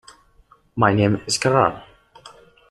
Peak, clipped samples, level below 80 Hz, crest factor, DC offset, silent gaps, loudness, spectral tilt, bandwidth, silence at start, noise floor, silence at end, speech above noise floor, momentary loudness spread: -2 dBFS; under 0.1%; -52 dBFS; 20 dB; under 0.1%; none; -19 LUFS; -5 dB/octave; 12 kHz; 0.75 s; -55 dBFS; 0.4 s; 37 dB; 14 LU